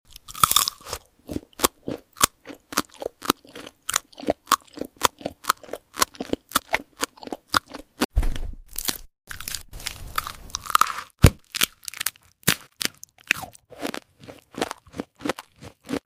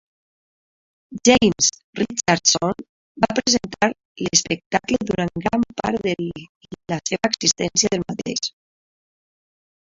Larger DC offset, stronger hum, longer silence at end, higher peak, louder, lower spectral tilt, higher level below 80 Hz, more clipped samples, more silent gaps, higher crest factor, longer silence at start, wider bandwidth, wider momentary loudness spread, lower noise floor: neither; neither; second, 0.1 s vs 1.4 s; about the same, 0 dBFS vs 0 dBFS; second, -26 LUFS vs -20 LUFS; about the same, -3 dB/octave vs -3 dB/octave; first, -36 dBFS vs -52 dBFS; neither; second, 8.05-8.09 s vs 1.84-1.93 s, 2.89-3.15 s, 4.05-4.15 s, 4.66-4.71 s, 6.49-6.61 s; first, 28 dB vs 22 dB; second, 0.3 s vs 1.1 s; first, 16 kHz vs 8 kHz; first, 17 LU vs 13 LU; second, -47 dBFS vs under -90 dBFS